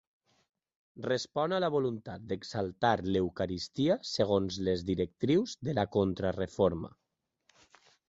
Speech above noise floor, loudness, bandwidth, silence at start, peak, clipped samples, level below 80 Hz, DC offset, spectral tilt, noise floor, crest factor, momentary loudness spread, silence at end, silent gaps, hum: 42 dB; -32 LUFS; 8 kHz; 0.95 s; -12 dBFS; under 0.1%; -56 dBFS; under 0.1%; -6 dB/octave; -73 dBFS; 20 dB; 8 LU; 1.2 s; none; none